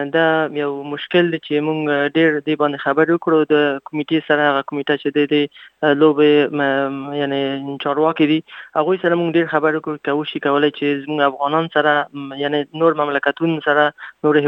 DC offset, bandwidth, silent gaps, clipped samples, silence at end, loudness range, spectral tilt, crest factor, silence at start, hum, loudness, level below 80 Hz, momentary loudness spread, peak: under 0.1%; 5.4 kHz; none; under 0.1%; 0 s; 2 LU; -8 dB/octave; 16 dB; 0 s; none; -18 LUFS; -72 dBFS; 6 LU; -2 dBFS